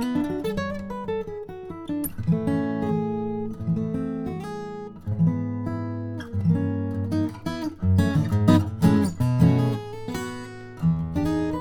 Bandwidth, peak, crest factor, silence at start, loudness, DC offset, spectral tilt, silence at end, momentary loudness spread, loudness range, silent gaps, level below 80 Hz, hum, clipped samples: 18 kHz; -4 dBFS; 22 dB; 0 s; -25 LUFS; under 0.1%; -8 dB/octave; 0 s; 13 LU; 6 LU; none; -46 dBFS; none; under 0.1%